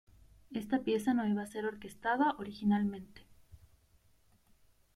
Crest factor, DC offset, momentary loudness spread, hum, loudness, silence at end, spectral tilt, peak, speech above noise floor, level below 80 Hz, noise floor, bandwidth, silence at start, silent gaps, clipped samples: 18 dB; under 0.1%; 10 LU; none; -34 LUFS; 1.4 s; -6.5 dB/octave; -18 dBFS; 34 dB; -66 dBFS; -68 dBFS; 14 kHz; 0.5 s; none; under 0.1%